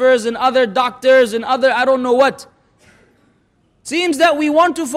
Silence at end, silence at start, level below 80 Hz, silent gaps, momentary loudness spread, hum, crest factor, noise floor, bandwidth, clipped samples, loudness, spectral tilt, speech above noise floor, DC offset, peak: 0 s; 0 s; -60 dBFS; none; 6 LU; none; 12 dB; -58 dBFS; 15 kHz; under 0.1%; -14 LUFS; -3 dB/octave; 44 dB; under 0.1%; -4 dBFS